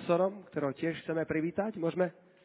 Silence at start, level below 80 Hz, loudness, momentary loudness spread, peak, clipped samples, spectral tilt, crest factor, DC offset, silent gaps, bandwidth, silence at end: 0 s; -68 dBFS; -33 LUFS; 6 LU; -14 dBFS; under 0.1%; -6.5 dB/octave; 18 dB; under 0.1%; none; 4 kHz; 0.35 s